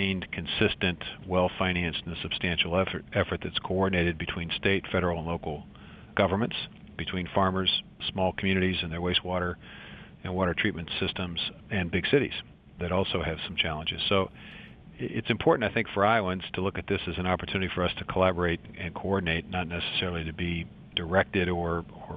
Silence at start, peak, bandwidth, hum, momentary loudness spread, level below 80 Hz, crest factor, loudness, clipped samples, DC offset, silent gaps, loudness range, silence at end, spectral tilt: 0 s; -6 dBFS; 5 kHz; none; 10 LU; -48 dBFS; 22 dB; -29 LUFS; under 0.1%; under 0.1%; none; 2 LU; 0 s; -8.5 dB/octave